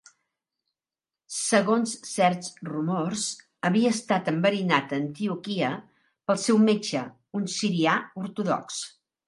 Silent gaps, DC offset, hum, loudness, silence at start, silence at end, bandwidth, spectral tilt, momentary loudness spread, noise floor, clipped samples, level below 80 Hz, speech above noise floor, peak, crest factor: none; under 0.1%; none; -26 LUFS; 1.3 s; 0.4 s; 11.5 kHz; -4.5 dB/octave; 12 LU; under -90 dBFS; under 0.1%; -74 dBFS; over 65 dB; -6 dBFS; 22 dB